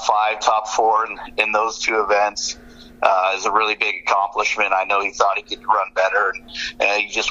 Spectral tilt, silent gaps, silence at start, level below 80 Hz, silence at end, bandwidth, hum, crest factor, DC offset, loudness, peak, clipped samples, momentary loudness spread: -0.5 dB/octave; none; 0 s; -52 dBFS; 0 s; 9.8 kHz; none; 20 dB; under 0.1%; -19 LUFS; 0 dBFS; under 0.1%; 5 LU